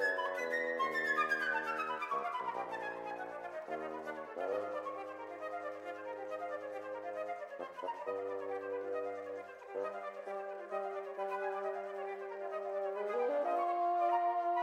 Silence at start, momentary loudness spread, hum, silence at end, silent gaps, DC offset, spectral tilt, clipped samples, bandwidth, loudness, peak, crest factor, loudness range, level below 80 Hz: 0 s; 11 LU; none; 0 s; none; under 0.1%; -4 dB/octave; under 0.1%; 15 kHz; -39 LUFS; -22 dBFS; 18 dB; 6 LU; -86 dBFS